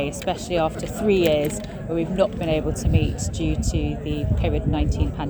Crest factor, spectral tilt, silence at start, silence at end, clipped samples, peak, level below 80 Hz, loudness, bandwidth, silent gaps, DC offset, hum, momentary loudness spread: 16 dB; -6 dB/octave; 0 s; 0 s; under 0.1%; -6 dBFS; -30 dBFS; -23 LUFS; over 20 kHz; none; under 0.1%; none; 7 LU